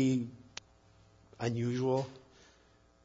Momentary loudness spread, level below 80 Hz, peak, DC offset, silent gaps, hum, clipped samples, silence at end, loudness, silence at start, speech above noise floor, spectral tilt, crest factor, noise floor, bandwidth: 18 LU; -70 dBFS; -16 dBFS; under 0.1%; none; none; under 0.1%; 0.85 s; -35 LUFS; 0 s; 33 dB; -7 dB/octave; 20 dB; -65 dBFS; 7.4 kHz